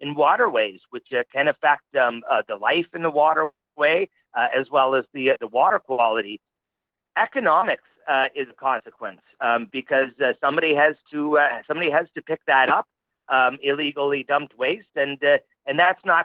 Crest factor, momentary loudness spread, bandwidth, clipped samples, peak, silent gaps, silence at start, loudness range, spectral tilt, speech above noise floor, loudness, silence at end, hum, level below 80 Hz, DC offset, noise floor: 18 dB; 9 LU; 5 kHz; under 0.1%; -4 dBFS; none; 0 s; 3 LU; -7.5 dB/octave; 64 dB; -21 LUFS; 0 s; none; -78 dBFS; under 0.1%; -86 dBFS